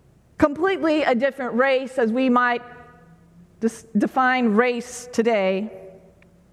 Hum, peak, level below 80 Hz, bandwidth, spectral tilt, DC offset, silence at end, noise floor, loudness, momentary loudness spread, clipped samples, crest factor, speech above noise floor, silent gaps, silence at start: none; -4 dBFS; -56 dBFS; 13.5 kHz; -5 dB/octave; under 0.1%; 0.55 s; -52 dBFS; -21 LUFS; 9 LU; under 0.1%; 18 dB; 32 dB; none; 0.4 s